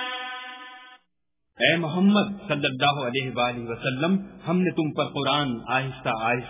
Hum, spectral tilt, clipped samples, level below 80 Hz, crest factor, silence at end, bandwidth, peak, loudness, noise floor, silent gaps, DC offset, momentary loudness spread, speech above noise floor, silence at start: none; -10 dB/octave; under 0.1%; -60 dBFS; 20 dB; 0 s; 3.9 kHz; -4 dBFS; -24 LUFS; -80 dBFS; none; under 0.1%; 10 LU; 56 dB; 0 s